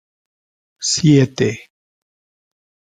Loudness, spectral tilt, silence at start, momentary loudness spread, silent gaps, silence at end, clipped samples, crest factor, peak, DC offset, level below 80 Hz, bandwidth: -16 LUFS; -5 dB/octave; 0.8 s; 11 LU; none; 1.25 s; under 0.1%; 18 dB; -2 dBFS; under 0.1%; -54 dBFS; 9.6 kHz